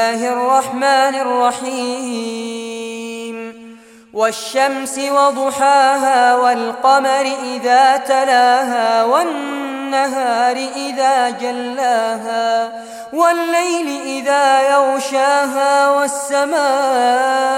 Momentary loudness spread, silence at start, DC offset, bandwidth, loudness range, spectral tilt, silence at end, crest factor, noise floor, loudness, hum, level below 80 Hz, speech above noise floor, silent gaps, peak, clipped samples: 11 LU; 0 s; under 0.1%; 16.5 kHz; 6 LU; -1.5 dB/octave; 0 s; 14 dB; -40 dBFS; -15 LUFS; none; -68 dBFS; 25 dB; none; -2 dBFS; under 0.1%